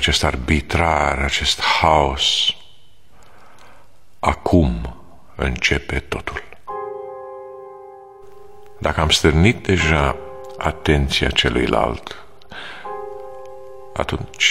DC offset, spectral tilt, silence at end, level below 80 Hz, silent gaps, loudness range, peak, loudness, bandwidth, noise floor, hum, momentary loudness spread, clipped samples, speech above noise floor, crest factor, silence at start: 1%; -4 dB/octave; 0 s; -30 dBFS; none; 8 LU; 0 dBFS; -18 LUFS; 14.5 kHz; -52 dBFS; none; 20 LU; under 0.1%; 34 dB; 20 dB; 0 s